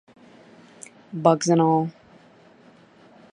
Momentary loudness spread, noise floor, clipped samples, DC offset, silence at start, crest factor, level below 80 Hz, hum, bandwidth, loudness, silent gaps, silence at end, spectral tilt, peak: 25 LU; -53 dBFS; under 0.1%; under 0.1%; 1.1 s; 24 dB; -72 dBFS; none; 11 kHz; -21 LUFS; none; 1.4 s; -6 dB/octave; -2 dBFS